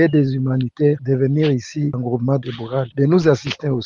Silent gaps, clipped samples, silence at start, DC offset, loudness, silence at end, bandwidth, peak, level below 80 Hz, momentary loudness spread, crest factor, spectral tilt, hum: none; under 0.1%; 0 s; under 0.1%; -19 LUFS; 0 s; 7.2 kHz; 0 dBFS; -54 dBFS; 7 LU; 16 dB; -8 dB/octave; none